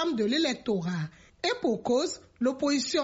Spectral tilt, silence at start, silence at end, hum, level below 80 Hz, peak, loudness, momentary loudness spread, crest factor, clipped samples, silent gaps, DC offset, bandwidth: -4 dB/octave; 0 s; 0 s; none; -64 dBFS; -14 dBFS; -29 LUFS; 7 LU; 14 dB; under 0.1%; none; under 0.1%; 8 kHz